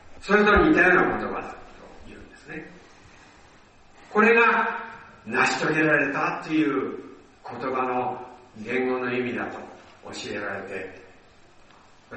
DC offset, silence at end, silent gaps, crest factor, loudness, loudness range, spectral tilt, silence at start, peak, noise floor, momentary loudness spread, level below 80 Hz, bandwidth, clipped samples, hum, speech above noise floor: under 0.1%; 0 s; none; 20 dB; -23 LUFS; 9 LU; -5.5 dB/octave; 0.05 s; -4 dBFS; -53 dBFS; 23 LU; -48 dBFS; 8.4 kHz; under 0.1%; none; 30 dB